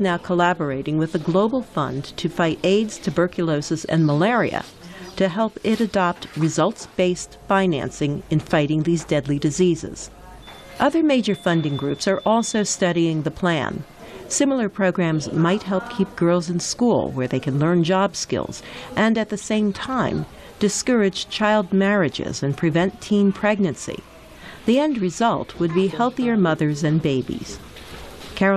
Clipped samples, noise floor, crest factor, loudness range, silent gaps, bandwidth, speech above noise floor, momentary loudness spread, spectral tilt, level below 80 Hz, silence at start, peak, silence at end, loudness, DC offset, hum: under 0.1%; -41 dBFS; 14 dB; 1 LU; none; 13 kHz; 20 dB; 11 LU; -5.5 dB/octave; -50 dBFS; 0 s; -6 dBFS; 0 s; -21 LUFS; under 0.1%; none